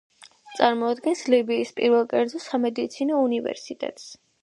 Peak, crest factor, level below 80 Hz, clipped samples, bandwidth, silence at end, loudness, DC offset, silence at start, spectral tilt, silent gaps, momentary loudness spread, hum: -2 dBFS; 22 dB; -74 dBFS; under 0.1%; 11.5 kHz; 0.3 s; -24 LUFS; under 0.1%; 0.2 s; -4 dB/octave; none; 12 LU; none